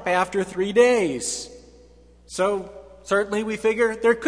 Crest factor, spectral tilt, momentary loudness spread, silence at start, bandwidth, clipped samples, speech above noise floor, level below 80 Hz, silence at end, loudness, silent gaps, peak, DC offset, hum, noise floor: 18 dB; -4 dB/octave; 16 LU; 0 s; 11 kHz; under 0.1%; 29 dB; -54 dBFS; 0 s; -22 LUFS; none; -6 dBFS; under 0.1%; 60 Hz at -50 dBFS; -51 dBFS